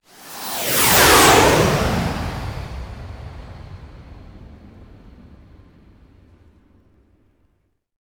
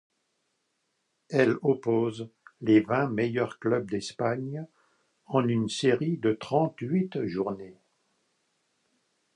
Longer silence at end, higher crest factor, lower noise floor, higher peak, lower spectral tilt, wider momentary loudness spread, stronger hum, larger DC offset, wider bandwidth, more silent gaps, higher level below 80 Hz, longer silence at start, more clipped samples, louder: first, 3.25 s vs 1.65 s; about the same, 20 dB vs 20 dB; second, -66 dBFS vs -77 dBFS; first, 0 dBFS vs -8 dBFS; second, -3 dB/octave vs -6.5 dB/octave; first, 27 LU vs 11 LU; neither; neither; first, over 20 kHz vs 10.5 kHz; neither; first, -36 dBFS vs -68 dBFS; second, 0.25 s vs 1.3 s; neither; first, -14 LUFS vs -28 LUFS